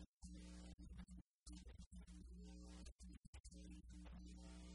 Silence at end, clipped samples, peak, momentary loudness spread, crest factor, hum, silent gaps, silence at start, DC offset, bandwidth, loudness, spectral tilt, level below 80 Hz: 0 s; under 0.1%; -46 dBFS; 3 LU; 14 dB; none; 0.08-0.20 s, 0.74-0.78 s, 1.21-1.42 s, 1.86-1.91 s, 2.92-2.99 s, 3.18-3.22 s, 3.28-3.33 s, 3.40-3.44 s; 0 s; under 0.1%; 11 kHz; -61 LUFS; -5 dB/octave; -62 dBFS